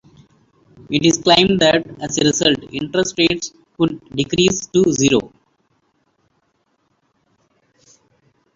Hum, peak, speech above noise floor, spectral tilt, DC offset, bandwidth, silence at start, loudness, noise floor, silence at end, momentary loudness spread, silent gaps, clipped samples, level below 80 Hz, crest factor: none; 0 dBFS; 49 dB; -3.5 dB/octave; under 0.1%; 7.8 kHz; 0.9 s; -16 LUFS; -65 dBFS; 3.3 s; 11 LU; none; under 0.1%; -50 dBFS; 18 dB